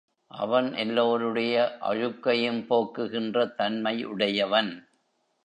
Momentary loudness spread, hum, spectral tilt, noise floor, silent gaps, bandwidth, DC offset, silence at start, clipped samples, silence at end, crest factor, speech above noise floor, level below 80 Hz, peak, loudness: 6 LU; none; -6 dB/octave; -72 dBFS; none; 9.4 kHz; under 0.1%; 0.35 s; under 0.1%; 0.65 s; 20 dB; 45 dB; -76 dBFS; -8 dBFS; -26 LUFS